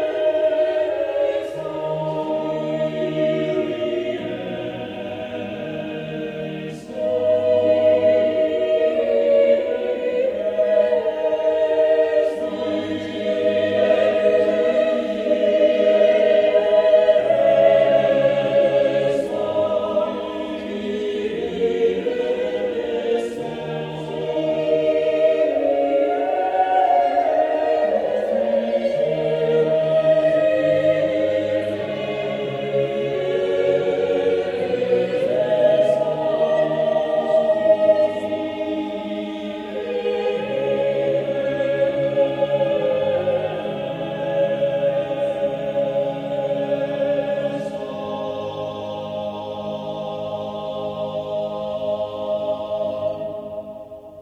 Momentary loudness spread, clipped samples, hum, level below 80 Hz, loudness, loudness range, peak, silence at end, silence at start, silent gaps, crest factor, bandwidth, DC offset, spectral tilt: 12 LU; under 0.1%; none; -58 dBFS; -20 LUFS; 9 LU; -2 dBFS; 0 s; 0 s; none; 18 dB; 8.6 kHz; under 0.1%; -6.5 dB/octave